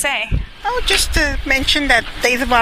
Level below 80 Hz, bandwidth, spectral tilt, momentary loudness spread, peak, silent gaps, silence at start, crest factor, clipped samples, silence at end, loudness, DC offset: -24 dBFS; 15.5 kHz; -2.5 dB/octave; 8 LU; 0 dBFS; none; 0 s; 16 dB; under 0.1%; 0 s; -16 LUFS; under 0.1%